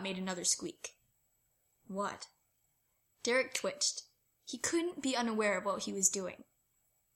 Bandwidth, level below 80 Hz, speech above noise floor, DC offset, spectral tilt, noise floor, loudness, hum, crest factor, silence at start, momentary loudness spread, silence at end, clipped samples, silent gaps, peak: 16.5 kHz; -78 dBFS; 42 dB; under 0.1%; -2 dB/octave; -78 dBFS; -34 LUFS; none; 26 dB; 0 s; 17 LU; 0.75 s; under 0.1%; none; -12 dBFS